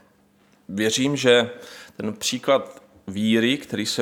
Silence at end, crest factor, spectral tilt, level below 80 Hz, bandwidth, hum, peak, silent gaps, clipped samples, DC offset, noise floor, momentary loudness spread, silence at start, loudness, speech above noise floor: 0 s; 20 dB; -3.5 dB/octave; -66 dBFS; 18 kHz; none; -4 dBFS; none; under 0.1%; under 0.1%; -59 dBFS; 21 LU; 0.7 s; -22 LUFS; 37 dB